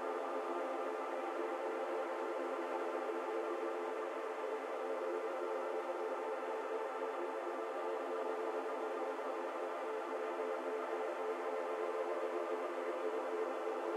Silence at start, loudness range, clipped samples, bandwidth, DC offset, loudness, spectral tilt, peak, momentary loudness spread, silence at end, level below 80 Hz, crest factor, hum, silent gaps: 0 s; 1 LU; under 0.1%; 14 kHz; under 0.1%; -40 LUFS; -2 dB/octave; -26 dBFS; 2 LU; 0 s; under -90 dBFS; 14 dB; none; none